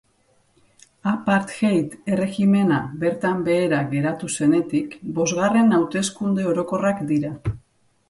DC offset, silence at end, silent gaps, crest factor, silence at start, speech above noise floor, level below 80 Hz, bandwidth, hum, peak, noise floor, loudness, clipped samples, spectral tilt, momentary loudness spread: under 0.1%; 0.5 s; none; 14 dB; 1.05 s; 42 dB; -54 dBFS; 11.5 kHz; none; -6 dBFS; -62 dBFS; -21 LUFS; under 0.1%; -6 dB/octave; 8 LU